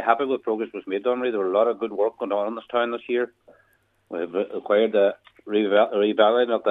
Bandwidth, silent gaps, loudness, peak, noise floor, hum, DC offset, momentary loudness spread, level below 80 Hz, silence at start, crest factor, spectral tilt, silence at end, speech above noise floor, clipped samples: 4 kHz; none; -23 LUFS; -2 dBFS; -64 dBFS; none; under 0.1%; 10 LU; -76 dBFS; 0 s; 20 dB; -7 dB/octave; 0 s; 41 dB; under 0.1%